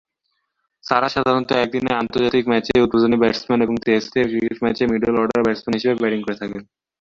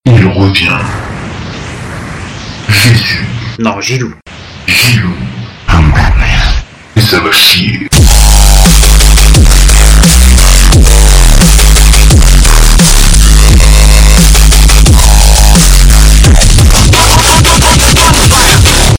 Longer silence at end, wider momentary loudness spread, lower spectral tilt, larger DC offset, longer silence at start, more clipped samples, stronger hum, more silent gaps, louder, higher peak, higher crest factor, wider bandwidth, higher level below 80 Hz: first, 0.4 s vs 0 s; second, 5 LU vs 14 LU; first, -6 dB/octave vs -3.5 dB/octave; neither; first, 0.85 s vs 0.05 s; second, under 0.1% vs 9%; neither; neither; second, -19 LUFS vs -5 LUFS; about the same, -2 dBFS vs 0 dBFS; first, 18 dB vs 4 dB; second, 7.4 kHz vs over 20 kHz; second, -50 dBFS vs -6 dBFS